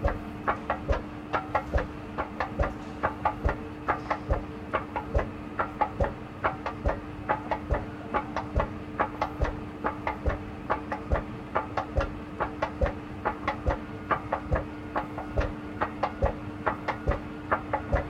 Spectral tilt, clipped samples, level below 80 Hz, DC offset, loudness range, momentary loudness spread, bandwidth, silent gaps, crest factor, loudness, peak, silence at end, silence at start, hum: -7.5 dB/octave; under 0.1%; -38 dBFS; under 0.1%; 1 LU; 4 LU; 10 kHz; none; 22 dB; -32 LUFS; -10 dBFS; 0 s; 0 s; none